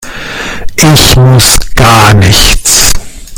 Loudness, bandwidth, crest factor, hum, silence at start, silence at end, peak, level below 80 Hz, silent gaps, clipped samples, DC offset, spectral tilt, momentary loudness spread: -4 LUFS; over 20 kHz; 6 dB; none; 0 s; 0 s; 0 dBFS; -14 dBFS; none; 9%; under 0.1%; -3.5 dB/octave; 14 LU